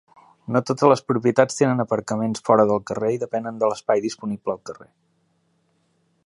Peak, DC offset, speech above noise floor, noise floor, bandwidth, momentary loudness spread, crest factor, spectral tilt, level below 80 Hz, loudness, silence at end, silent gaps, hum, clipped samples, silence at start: 0 dBFS; under 0.1%; 45 dB; -66 dBFS; 11.5 kHz; 11 LU; 22 dB; -6 dB/octave; -64 dBFS; -21 LUFS; 1.45 s; none; none; under 0.1%; 0.5 s